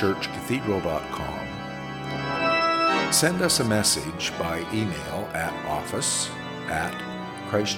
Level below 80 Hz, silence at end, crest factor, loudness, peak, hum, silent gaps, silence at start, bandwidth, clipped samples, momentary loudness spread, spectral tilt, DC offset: -52 dBFS; 0 s; 20 dB; -25 LUFS; -6 dBFS; none; none; 0 s; 18 kHz; under 0.1%; 12 LU; -3 dB/octave; under 0.1%